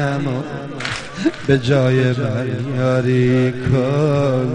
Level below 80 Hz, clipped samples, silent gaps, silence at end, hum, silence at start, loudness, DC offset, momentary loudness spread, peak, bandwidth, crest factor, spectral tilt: -46 dBFS; under 0.1%; none; 0 s; none; 0 s; -18 LUFS; under 0.1%; 9 LU; -2 dBFS; 10 kHz; 16 dB; -7.5 dB/octave